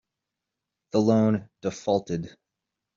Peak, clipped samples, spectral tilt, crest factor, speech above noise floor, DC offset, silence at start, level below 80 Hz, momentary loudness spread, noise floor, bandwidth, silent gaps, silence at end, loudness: -8 dBFS; under 0.1%; -7.5 dB/octave; 20 dB; 61 dB; under 0.1%; 0.95 s; -64 dBFS; 12 LU; -86 dBFS; 7.6 kHz; none; 0.65 s; -26 LUFS